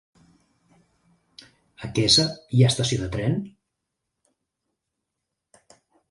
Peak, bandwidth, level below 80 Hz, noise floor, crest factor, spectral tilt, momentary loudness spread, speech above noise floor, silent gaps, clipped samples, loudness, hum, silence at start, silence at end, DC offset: -6 dBFS; 11.5 kHz; -52 dBFS; -82 dBFS; 22 dB; -4.5 dB/octave; 14 LU; 61 dB; none; under 0.1%; -21 LUFS; none; 1.8 s; 2.6 s; under 0.1%